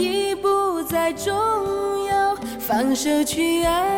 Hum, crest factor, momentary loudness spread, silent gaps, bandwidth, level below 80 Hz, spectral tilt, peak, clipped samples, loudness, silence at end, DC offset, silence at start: none; 12 dB; 4 LU; none; 17.5 kHz; -46 dBFS; -3.5 dB/octave; -10 dBFS; under 0.1%; -21 LUFS; 0 s; under 0.1%; 0 s